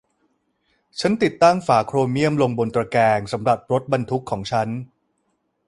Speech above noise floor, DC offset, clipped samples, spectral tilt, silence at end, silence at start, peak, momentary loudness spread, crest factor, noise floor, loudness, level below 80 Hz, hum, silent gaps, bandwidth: 51 dB; under 0.1%; under 0.1%; -6 dB/octave; 0.85 s; 0.95 s; -2 dBFS; 9 LU; 18 dB; -70 dBFS; -20 LUFS; -54 dBFS; none; none; 11.5 kHz